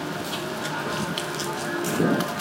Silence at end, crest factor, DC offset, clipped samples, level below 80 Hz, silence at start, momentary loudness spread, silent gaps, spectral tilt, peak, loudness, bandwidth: 0 s; 20 dB; under 0.1%; under 0.1%; -58 dBFS; 0 s; 6 LU; none; -4 dB/octave; -8 dBFS; -27 LUFS; 17 kHz